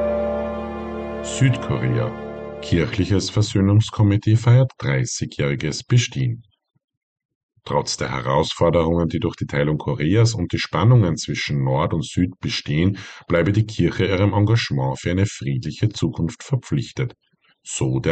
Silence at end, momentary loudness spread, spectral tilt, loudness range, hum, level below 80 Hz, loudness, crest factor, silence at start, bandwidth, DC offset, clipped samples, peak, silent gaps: 0 s; 10 LU; -6 dB/octave; 5 LU; none; -42 dBFS; -21 LUFS; 14 dB; 0 s; 9 kHz; under 0.1%; under 0.1%; -6 dBFS; 6.84-6.88 s, 6.97-7.16 s, 7.25-7.29 s, 7.35-7.49 s